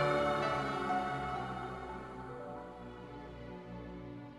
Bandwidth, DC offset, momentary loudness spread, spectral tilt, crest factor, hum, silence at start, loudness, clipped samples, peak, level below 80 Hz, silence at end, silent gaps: 13 kHz; under 0.1%; 16 LU; -6 dB/octave; 18 dB; none; 0 s; -39 LUFS; under 0.1%; -20 dBFS; -58 dBFS; 0 s; none